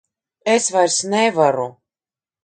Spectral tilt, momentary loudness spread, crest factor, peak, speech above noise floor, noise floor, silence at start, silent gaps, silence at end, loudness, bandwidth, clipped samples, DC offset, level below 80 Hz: -3 dB/octave; 10 LU; 18 dB; -2 dBFS; over 73 dB; under -90 dBFS; 0.45 s; none; 0.75 s; -17 LUFS; 9.6 kHz; under 0.1%; under 0.1%; -70 dBFS